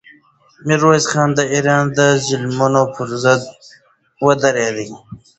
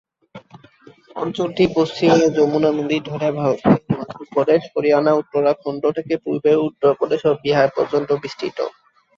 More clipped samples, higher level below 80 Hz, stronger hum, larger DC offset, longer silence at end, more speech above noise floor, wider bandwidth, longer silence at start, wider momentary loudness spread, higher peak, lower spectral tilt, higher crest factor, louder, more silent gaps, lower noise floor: neither; about the same, -54 dBFS vs -56 dBFS; neither; neither; second, 0.2 s vs 0.5 s; first, 34 dB vs 30 dB; first, 8.2 kHz vs 7.4 kHz; first, 0.65 s vs 0.35 s; first, 13 LU vs 10 LU; about the same, 0 dBFS vs 0 dBFS; second, -4.5 dB/octave vs -6.5 dB/octave; about the same, 16 dB vs 18 dB; first, -15 LUFS vs -19 LUFS; neither; about the same, -50 dBFS vs -48 dBFS